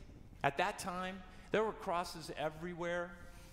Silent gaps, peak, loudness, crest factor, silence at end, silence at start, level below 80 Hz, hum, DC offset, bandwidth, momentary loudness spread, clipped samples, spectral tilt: none; -16 dBFS; -39 LUFS; 24 dB; 0 s; 0 s; -58 dBFS; none; under 0.1%; 16 kHz; 12 LU; under 0.1%; -4.5 dB/octave